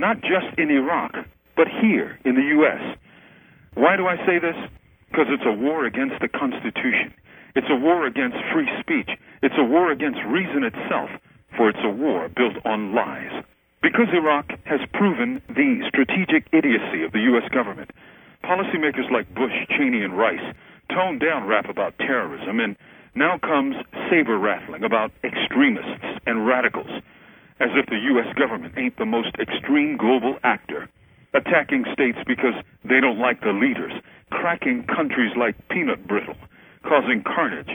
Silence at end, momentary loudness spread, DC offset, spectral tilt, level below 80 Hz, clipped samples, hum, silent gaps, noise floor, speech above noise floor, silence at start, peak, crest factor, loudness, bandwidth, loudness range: 0 s; 12 LU; under 0.1%; -8 dB/octave; -60 dBFS; under 0.1%; none; none; -51 dBFS; 29 dB; 0 s; -2 dBFS; 20 dB; -21 LUFS; 18 kHz; 3 LU